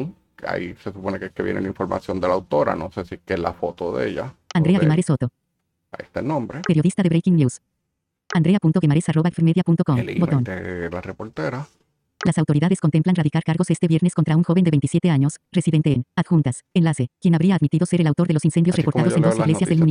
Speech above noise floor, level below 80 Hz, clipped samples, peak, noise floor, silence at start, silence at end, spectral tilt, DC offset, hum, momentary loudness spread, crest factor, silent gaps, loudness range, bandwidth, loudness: 58 dB; -54 dBFS; under 0.1%; -4 dBFS; -78 dBFS; 0 s; 0 s; -7.5 dB/octave; under 0.1%; none; 11 LU; 16 dB; none; 5 LU; 10.5 kHz; -20 LUFS